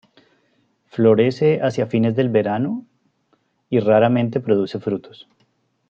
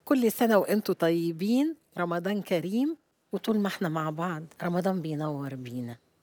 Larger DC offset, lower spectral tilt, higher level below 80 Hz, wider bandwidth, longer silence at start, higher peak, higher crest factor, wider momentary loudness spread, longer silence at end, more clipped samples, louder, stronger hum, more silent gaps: neither; first, -8.5 dB/octave vs -6.5 dB/octave; first, -66 dBFS vs -80 dBFS; second, 7.2 kHz vs over 20 kHz; first, 0.95 s vs 0.05 s; first, -2 dBFS vs -10 dBFS; about the same, 18 dB vs 18 dB; about the same, 11 LU vs 12 LU; first, 0.8 s vs 0.25 s; neither; first, -19 LUFS vs -29 LUFS; neither; neither